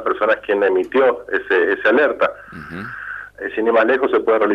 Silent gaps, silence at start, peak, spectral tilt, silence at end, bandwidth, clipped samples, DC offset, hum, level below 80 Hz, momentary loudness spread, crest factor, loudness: none; 0 s; -4 dBFS; -6.5 dB/octave; 0 s; 6.8 kHz; under 0.1%; under 0.1%; 50 Hz at -55 dBFS; -54 dBFS; 15 LU; 14 dB; -17 LUFS